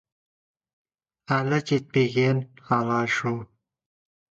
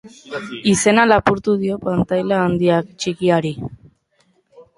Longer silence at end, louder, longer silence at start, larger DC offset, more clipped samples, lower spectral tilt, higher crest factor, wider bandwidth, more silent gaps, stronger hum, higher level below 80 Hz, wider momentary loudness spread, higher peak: first, 0.85 s vs 0.15 s; second, -25 LUFS vs -17 LUFS; first, 1.3 s vs 0.05 s; neither; neither; first, -6.5 dB/octave vs -5 dB/octave; about the same, 18 dB vs 18 dB; second, 7.8 kHz vs 11.5 kHz; neither; neither; second, -64 dBFS vs -46 dBFS; second, 6 LU vs 16 LU; second, -8 dBFS vs -2 dBFS